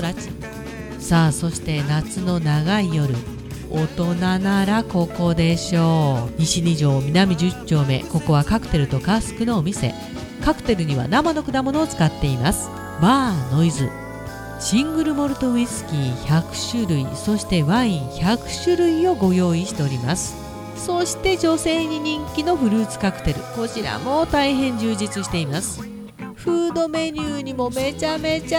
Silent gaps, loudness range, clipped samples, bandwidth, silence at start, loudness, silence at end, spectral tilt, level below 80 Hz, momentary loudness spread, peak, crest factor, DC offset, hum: none; 3 LU; under 0.1%; 17 kHz; 0 s; -21 LUFS; 0 s; -5.5 dB/octave; -38 dBFS; 9 LU; -2 dBFS; 18 dB; under 0.1%; none